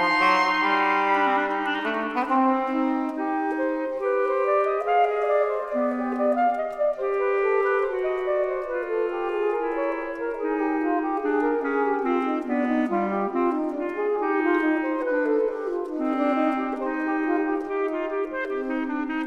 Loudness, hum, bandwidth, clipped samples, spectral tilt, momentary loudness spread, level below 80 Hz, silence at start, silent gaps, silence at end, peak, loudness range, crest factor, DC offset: -24 LUFS; none; 10 kHz; under 0.1%; -6 dB/octave; 6 LU; -58 dBFS; 0 s; none; 0 s; -8 dBFS; 2 LU; 16 dB; under 0.1%